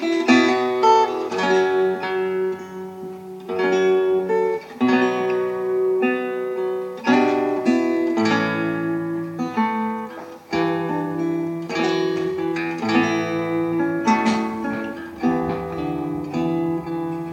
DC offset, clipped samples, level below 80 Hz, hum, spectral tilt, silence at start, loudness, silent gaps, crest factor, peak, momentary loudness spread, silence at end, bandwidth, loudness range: under 0.1%; under 0.1%; -58 dBFS; none; -6 dB/octave; 0 s; -21 LUFS; none; 18 dB; -2 dBFS; 9 LU; 0 s; 15.5 kHz; 3 LU